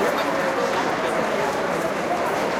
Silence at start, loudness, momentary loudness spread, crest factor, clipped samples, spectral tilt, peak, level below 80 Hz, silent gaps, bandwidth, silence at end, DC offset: 0 s; -23 LUFS; 2 LU; 12 dB; under 0.1%; -4 dB/octave; -10 dBFS; -56 dBFS; none; 16.5 kHz; 0 s; under 0.1%